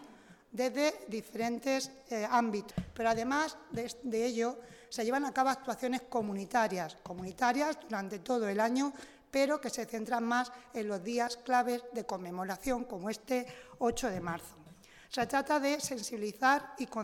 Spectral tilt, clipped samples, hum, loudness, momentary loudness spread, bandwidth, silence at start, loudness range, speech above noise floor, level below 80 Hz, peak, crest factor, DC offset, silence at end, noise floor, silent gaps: -4 dB/octave; under 0.1%; none; -34 LUFS; 10 LU; 18 kHz; 0 s; 2 LU; 23 dB; -62 dBFS; -14 dBFS; 20 dB; under 0.1%; 0 s; -57 dBFS; none